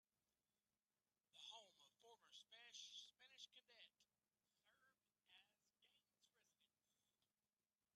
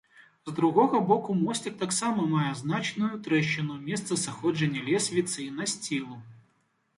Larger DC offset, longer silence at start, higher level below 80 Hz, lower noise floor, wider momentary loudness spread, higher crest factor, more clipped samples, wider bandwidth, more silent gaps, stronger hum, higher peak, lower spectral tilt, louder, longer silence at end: neither; first, 1.35 s vs 0.2 s; second, under -90 dBFS vs -70 dBFS; first, under -90 dBFS vs -71 dBFS; about the same, 9 LU vs 9 LU; about the same, 24 dB vs 20 dB; neither; about the same, 11.5 kHz vs 11.5 kHz; neither; neither; second, -48 dBFS vs -8 dBFS; second, 1.5 dB/octave vs -4.5 dB/octave; second, -63 LUFS vs -28 LUFS; about the same, 0.7 s vs 0.6 s